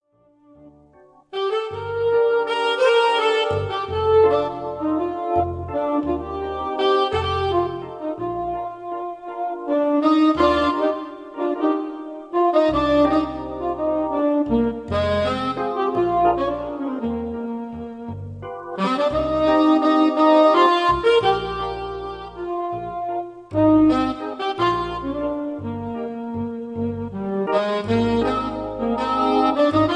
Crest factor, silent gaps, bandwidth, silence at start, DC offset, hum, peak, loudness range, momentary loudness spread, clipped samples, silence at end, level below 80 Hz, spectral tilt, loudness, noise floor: 16 dB; none; 9.8 kHz; 0.65 s; under 0.1%; none; -4 dBFS; 6 LU; 13 LU; under 0.1%; 0 s; -44 dBFS; -6.5 dB/octave; -21 LUFS; -57 dBFS